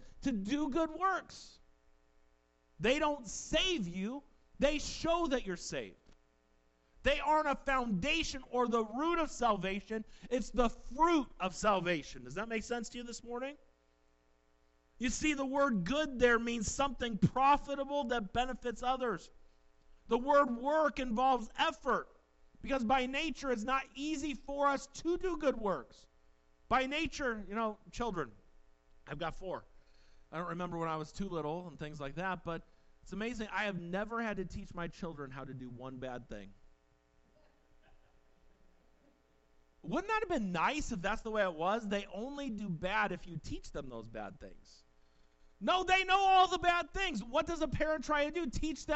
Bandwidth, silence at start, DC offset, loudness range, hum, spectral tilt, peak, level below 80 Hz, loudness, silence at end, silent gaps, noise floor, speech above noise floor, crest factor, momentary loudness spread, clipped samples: 8.2 kHz; 0 s; under 0.1%; 10 LU; none; -4.5 dB/octave; -16 dBFS; -52 dBFS; -35 LUFS; 0 s; none; -71 dBFS; 36 dB; 20 dB; 15 LU; under 0.1%